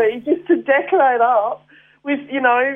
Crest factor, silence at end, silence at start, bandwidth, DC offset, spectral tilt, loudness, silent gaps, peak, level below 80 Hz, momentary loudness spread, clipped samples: 14 dB; 0 s; 0 s; 3.7 kHz; under 0.1%; -7.5 dB/octave; -17 LUFS; none; -4 dBFS; -68 dBFS; 11 LU; under 0.1%